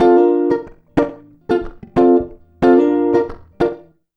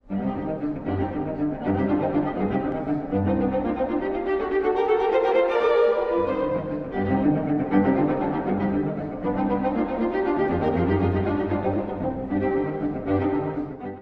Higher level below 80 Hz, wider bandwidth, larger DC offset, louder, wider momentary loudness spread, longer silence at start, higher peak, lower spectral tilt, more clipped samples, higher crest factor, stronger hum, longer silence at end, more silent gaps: first, -40 dBFS vs -46 dBFS; about the same, 6 kHz vs 5.8 kHz; neither; first, -16 LUFS vs -24 LUFS; first, 12 LU vs 7 LU; about the same, 0 s vs 0.1 s; first, 0 dBFS vs -8 dBFS; second, -8.5 dB/octave vs -10 dB/octave; neither; about the same, 16 dB vs 16 dB; neither; first, 0.4 s vs 0 s; neither